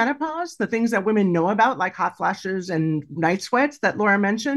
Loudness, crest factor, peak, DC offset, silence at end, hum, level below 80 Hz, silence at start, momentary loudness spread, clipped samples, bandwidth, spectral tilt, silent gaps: -22 LUFS; 16 dB; -6 dBFS; under 0.1%; 0 s; none; -68 dBFS; 0 s; 6 LU; under 0.1%; 12.5 kHz; -6 dB/octave; none